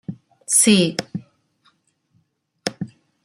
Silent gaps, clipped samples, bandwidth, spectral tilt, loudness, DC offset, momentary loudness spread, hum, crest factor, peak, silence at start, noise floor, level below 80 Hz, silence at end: none; under 0.1%; 15.5 kHz; -3 dB/octave; -18 LUFS; under 0.1%; 22 LU; none; 20 dB; -2 dBFS; 0.1 s; -66 dBFS; -64 dBFS; 0.35 s